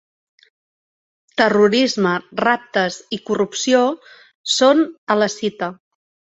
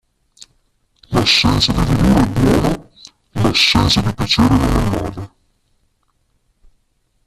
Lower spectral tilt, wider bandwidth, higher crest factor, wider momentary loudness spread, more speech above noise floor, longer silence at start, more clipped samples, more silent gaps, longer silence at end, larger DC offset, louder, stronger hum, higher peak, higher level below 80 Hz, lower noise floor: second, -3.5 dB/octave vs -5 dB/octave; second, 8.2 kHz vs 14.5 kHz; about the same, 18 dB vs 16 dB; about the same, 14 LU vs 14 LU; first, over 73 dB vs 49 dB; first, 1.35 s vs 1.1 s; neither; first, 4.35-4.44 s, 4.98-5.07 s vs none; second, 0.65 s vs 2 s; neither; second, -18 LUFS vs -14 LUFS; neither; about the same, -2 dBFS vs 0 dBFS; second, -64 dBFS vs -28 dBFS; first, under -90 dBFS vs -63 dBFS